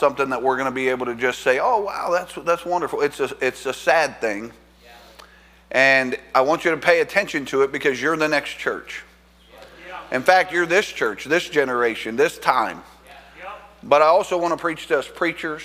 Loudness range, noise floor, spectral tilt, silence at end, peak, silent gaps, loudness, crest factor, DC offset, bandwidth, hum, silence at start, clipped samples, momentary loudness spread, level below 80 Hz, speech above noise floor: 4 LU; -50 dBFS; -3.5 dB/octave; 0 s; 0 dBFS; none; -20 LUFS; 22 dB; under 0.1%; 16 kHz; none; 0 s; under 0.1%; 11 LU; -56 dBFS; 30 dB